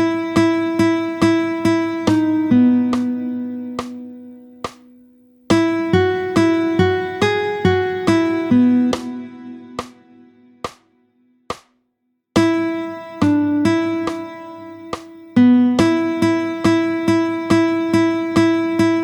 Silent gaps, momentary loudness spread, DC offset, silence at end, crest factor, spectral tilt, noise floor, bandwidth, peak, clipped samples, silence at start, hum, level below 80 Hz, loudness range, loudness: none; 18 LU; under 0.1%; 0 s; 16 dB; -6.5 dB/octave; -70 dBFS; 12 kHz; -2 dBFS; under 0.1%; 0 s; none; -50 dBFS; 7 LU; -17 LUFS